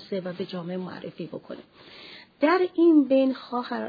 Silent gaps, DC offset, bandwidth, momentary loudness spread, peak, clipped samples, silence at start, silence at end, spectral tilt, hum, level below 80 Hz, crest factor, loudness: none; under 0.1%; 5 kHz; 24 LU; -10 dBFS; under 0.1%; 0 s; 0 s; -8.5 dB/octave; none; -76 dBFS; 16 dB; -24 LUFS